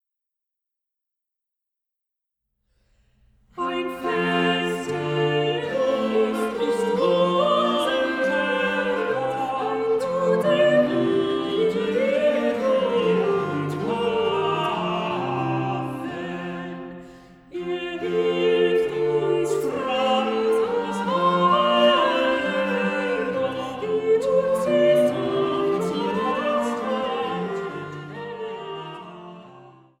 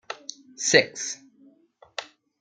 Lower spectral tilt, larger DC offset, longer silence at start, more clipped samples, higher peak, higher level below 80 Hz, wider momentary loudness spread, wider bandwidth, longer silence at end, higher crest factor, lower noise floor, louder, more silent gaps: first, -5.5 dB/octave vs -1.5 dB/octave; neither; first, 3.55 s vs 0.1 s; neither; second, -8 dBFS vs -2 dBFS; first, -60 dBFS vs -72 dBFS; second, 13 LU vs 19 LU; first, 15 kHz vs 10 kHz; about the same, 0.3 s vs 0.4 s; second, 16 dB vs 26 dB; first, -85 dBFS vs -58 dBFS; about the same, -22 LUFS vs -22 LUFS; neither